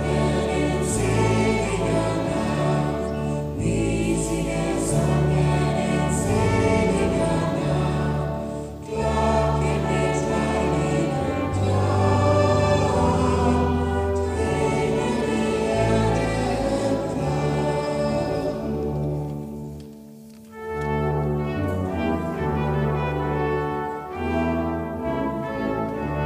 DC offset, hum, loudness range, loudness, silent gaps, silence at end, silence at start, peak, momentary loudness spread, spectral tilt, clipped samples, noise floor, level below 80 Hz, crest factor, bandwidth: under 0.1%; none; 6 LU; -23 LUFS; none; 0 s; 0 s; -8 dBFS; 7 LU; -6.5 dB/octave; under 0.1%; -43 dBFS; -34 dBFS; 14 dB; 15 kHz